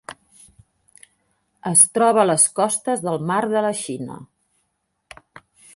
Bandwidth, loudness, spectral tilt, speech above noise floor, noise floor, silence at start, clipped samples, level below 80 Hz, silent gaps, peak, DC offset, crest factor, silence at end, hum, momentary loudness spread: 12 kHz; -17 LUFS; -3.5 dB/octave; 53 dB; -72 dBFS; 0.1 s; under 0.1%; -66 dBFS; none; 0 dBFS; under 0.1%; 22 dB; 1.5 s; none; 19 LU